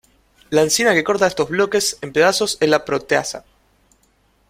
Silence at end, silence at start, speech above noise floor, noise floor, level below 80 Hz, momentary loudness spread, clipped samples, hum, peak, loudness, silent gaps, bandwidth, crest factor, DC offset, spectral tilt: 1.1 s; 0.5 s; 42 dB; -60 dBFS; -54 dBFS; 5 LU; under 0.1%; none; -2 dBFS; -17 LUFS; none; 16.5 kHz; 18 dB; under 0.1%; -3 dB/octave